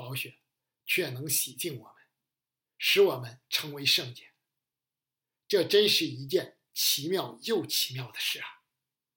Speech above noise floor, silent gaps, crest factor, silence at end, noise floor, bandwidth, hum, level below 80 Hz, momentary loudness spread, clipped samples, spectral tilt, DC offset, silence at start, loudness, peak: over 61 dB; none; 20 dB; 0.65 s; under -90 dBFS; 17 kHz; none; -86 dBFS; 14 LU; under 0.1%; -2.5 dB/octave; under 0.1%; 0 s; -28 LUFS; -10 dBFS